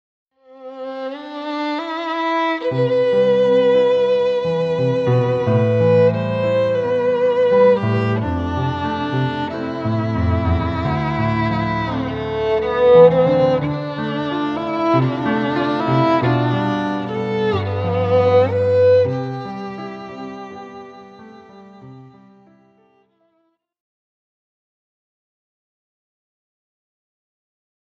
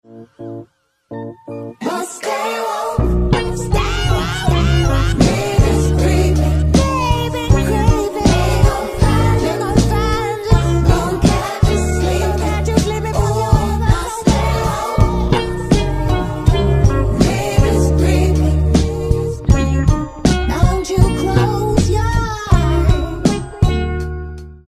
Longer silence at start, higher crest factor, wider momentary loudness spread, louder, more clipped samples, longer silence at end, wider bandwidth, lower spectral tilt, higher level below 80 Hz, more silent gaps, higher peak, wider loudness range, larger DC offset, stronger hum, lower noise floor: first, 0.5 s vs 0.1 s; about the same, 18 dB vs 14 dB; first, 14 LU vs 6 LU; about the same, -17 LUFS vs -16 LUFS; neither; first, 5.85 s vs 0.1 s; second, 6.8 kHz vs 15 kHz; first, -8.5 dB/octave vs -6 dB/octave; second, -42 dBFS vs -20 dBFS; neither; about the same, 0 dBFS vs 0 dBFS; first, 5 LU vs 2 LU; neither; neither; first, -66 dBFS vs -46 dBFS